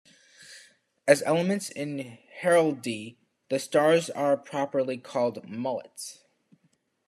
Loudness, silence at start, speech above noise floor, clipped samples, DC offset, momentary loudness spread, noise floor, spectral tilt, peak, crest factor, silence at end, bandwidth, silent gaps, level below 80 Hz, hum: -27 LUFS; 0.5 s; 44 dB; under 0.1%; under 0.1%; 18 LU; -71 dBFS; -5 dB/octave; -4 dBFS; 24 dB; 0.95 s; 13 kHz; none; -80 dBFS; none